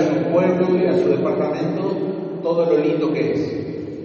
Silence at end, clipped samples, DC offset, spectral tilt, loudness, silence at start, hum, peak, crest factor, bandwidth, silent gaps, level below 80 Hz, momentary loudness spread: 0 s; under 0.1%; under 0.1%; -7 dB/octave; -20 LUFS; 0 s; none; -4 dBFS; 14 dB; 6.8 kHz; none; -60 dBFS; 8 LU